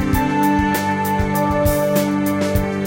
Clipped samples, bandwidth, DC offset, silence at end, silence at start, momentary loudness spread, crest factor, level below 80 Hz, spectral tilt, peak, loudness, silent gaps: under 0.1%; 17 kHz; under 0.1%; 0 s; 0 s; 3 LU; 14 dB; -30 dBFS; -6 dB/octave; -4 dBFS; -18 LUFS; none